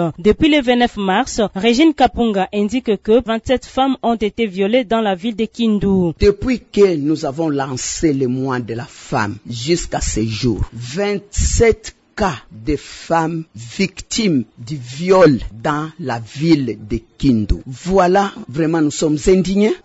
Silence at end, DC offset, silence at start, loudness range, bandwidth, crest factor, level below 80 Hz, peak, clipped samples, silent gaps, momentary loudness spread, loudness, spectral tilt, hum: 0.05 s; under 0.1%; 0 s; 4 LU; 8 kHz; 14 dB; -32 dBFS; -2 dBFS; under 0.1%; none; 11 LU; -17 LUFS; -5.5 dB/octave; none